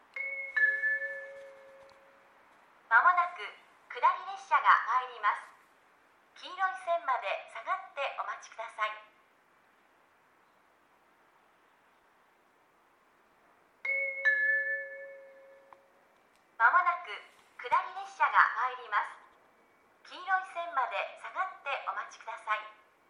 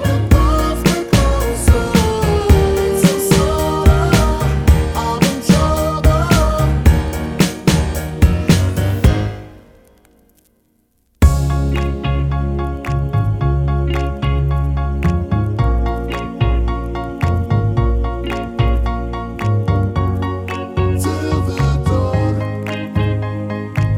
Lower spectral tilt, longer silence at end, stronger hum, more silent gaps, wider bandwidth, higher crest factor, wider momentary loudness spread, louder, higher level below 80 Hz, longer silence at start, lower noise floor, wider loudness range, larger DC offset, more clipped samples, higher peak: second, 0 dB/octave vs -6 dB/octave; first, 0.4 s vs 0 s; neither; neither; second, 11 kHz vs 19.5 kHz; first, 26 dB vs 14 dB; first, 20 LU vs 8 LU; second, -30 LUFS vs -16 LUFS; second, under -90 dBFS vs -20 dBFS; first, 0.15 s vs 0 s; first, -67 dBFS vs -60 dBFS; first, 11 LU vs 5 LU; neither; neither; second, -8 dBFS vs 0 dBFS